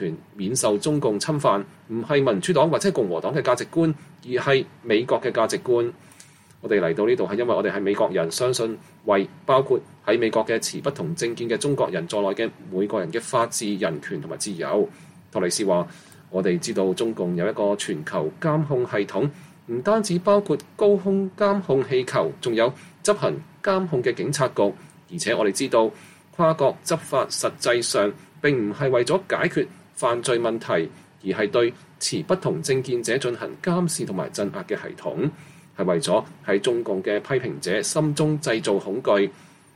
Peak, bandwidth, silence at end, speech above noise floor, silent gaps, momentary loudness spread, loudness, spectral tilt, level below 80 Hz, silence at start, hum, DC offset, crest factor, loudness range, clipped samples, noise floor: -6 dBFS; 15.5 kHz; 0.45 s; 27 dB; none; 7 LU; -23 LUFS; -5 dB/octave; -66 dBFS; 0 s; none; under 0.1%; 18 dB; 3 LU; under 0.1%; -50 dBFS